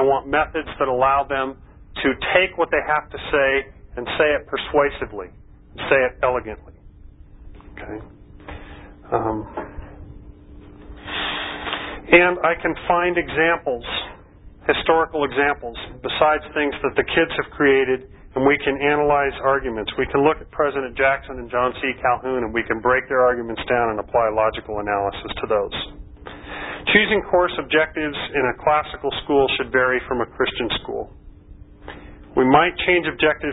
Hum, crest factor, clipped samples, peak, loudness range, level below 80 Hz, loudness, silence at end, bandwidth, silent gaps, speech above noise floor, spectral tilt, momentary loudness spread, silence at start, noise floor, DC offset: none; 22 dB; under 0.1%; 0 dBFS; 9 LU; -42 dBFS; -20 LUFS; 0 s; 4 kHz; none; 24 dB; -9.5 dB/octave; 16 LU; 0 s; -44 dBFS; under 0.1%